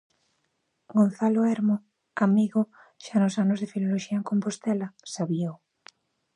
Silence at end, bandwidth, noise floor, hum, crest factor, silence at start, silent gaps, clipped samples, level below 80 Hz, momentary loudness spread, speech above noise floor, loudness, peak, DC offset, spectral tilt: 0.8 s; 10.5 kHz; -75 dBFS; none; 18 dB; 0.9 s; none; under 0.1%; -76 dBFS; 10 LU; 51 dB; -26 LUFS; -10 dBFS; under 0.1%; -7 dB/octave